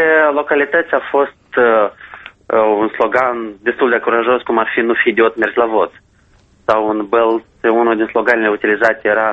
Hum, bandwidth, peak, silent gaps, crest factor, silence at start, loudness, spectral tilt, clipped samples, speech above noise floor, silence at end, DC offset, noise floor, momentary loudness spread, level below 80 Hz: none; 7.6 kHz; 0 dBFS; none; 14 dB; 0 s; -14 LUFS; -6 dB/octave; under 0.1%; 37 dB; 0 s; under 0.1%; -51 dBFS; 5 LU; -56 dBFS